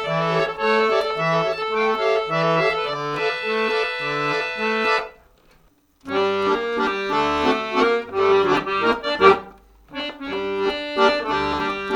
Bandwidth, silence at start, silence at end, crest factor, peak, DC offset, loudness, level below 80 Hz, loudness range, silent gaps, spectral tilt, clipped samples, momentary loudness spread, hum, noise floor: 16.5 kHz; 0 s; 0 s; 20 dB; -2 dBFS; under 0.1%; -21 LUFS; -52 dBFS; 4 LU; none; -5 dB/octave; under 0.1%; 6 LU; none; -57 dBFS